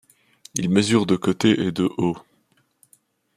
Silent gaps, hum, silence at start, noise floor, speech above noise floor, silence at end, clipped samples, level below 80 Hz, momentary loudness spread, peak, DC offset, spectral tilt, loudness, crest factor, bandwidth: none; none; 0.55 s; -65 dBFS; 45 dB; 1.15 s; under 0.1%; -60 dBFS; 9 LU; -4 dBFS; under 0.1%; -5 dB/octave; -21 LUFS; 20 dB; 15 kHz